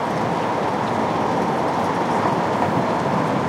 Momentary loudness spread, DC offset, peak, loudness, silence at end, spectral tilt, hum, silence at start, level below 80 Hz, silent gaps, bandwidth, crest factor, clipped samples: 2 LU; under 0.1%; -6 dBFS; -21 LUFS; 0 s; -6.5 dB/octave; none; 0 s; -52 dBFS; none; 16 kHz; 14 dB; under 0.1%